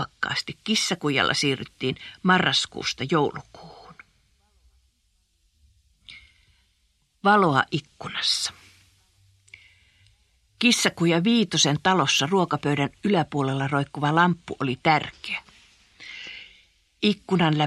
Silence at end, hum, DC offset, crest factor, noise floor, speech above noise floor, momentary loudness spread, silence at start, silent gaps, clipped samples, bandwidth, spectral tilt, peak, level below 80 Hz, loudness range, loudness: 0 s; none; under 0.1%; 22 dB; -68 dBFS; 45 dB; 12 LU; 0 s; none; under 0.1%; 13 kHz; -4 dB/octave; -4 dBFS; -60 dBFS; 6 LU; -23 LUFS